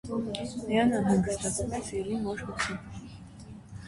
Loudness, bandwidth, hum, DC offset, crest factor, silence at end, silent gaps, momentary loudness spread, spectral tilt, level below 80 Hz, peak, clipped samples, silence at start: -30 LUFS; 11.5 kHz; none; under 0.1%; 18 dB; 0 s; none; 21 LU; -5 dB/octave; -50 dBFS; -14 dBFS; under 0.1%; 0.05 s